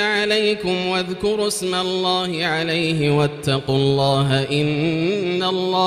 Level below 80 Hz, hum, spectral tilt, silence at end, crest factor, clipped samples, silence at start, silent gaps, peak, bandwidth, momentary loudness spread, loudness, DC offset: -50 dBFS; none; -5 dB/octave; 0 s; 14 dB; under 0.1%; 0 s; none; -4 dBFS; 15.5 kHz; 4 LU; -19 LUFS; under 0.1%